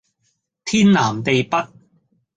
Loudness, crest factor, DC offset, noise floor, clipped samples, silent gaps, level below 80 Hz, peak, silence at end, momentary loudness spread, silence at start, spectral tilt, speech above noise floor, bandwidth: -17 LUFS; 16 dB; under 0.1%; -69 dBFS; under 0.1%; none; -54 dBFS; -4 dBFS; 0.7 s; 15 LU; 0.65 s; -5 dB/octave; 53 dB; 9.2 kHz